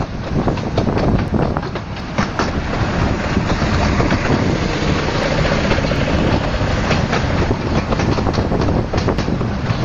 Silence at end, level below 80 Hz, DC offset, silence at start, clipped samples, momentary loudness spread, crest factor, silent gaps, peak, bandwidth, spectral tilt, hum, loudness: 0 s; -24 dBFS; under 0.1%; 0 s; under 0.1%; 4 LU; 16 dB; none; -2 dBFS; 8 kHz; -6.5 dB/octave; none; -18 LUFS